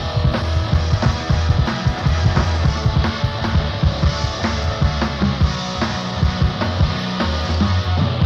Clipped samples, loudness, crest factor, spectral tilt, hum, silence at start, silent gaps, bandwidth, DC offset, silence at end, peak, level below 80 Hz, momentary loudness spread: under 0.1%; -19 LUFS; 14 dB; -6 dB/octave; none; 0 s; none; 7.6 kHz; 0.1%; 0 s; -2 dBFS; -24 dBFS; 3 LU